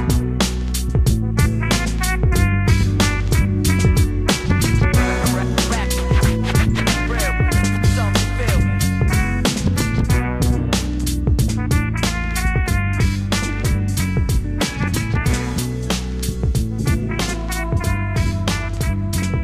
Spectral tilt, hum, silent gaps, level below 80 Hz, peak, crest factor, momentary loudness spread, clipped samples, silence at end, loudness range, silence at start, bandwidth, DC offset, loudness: -5 dB/octave; none; none; -22 dBFS; -4 dBFS; 14 dB; 5 LU; under 0.1%; 0 s; 4 LU; 0 s; 15.5 kHz; under 0.1%; -19 LUFS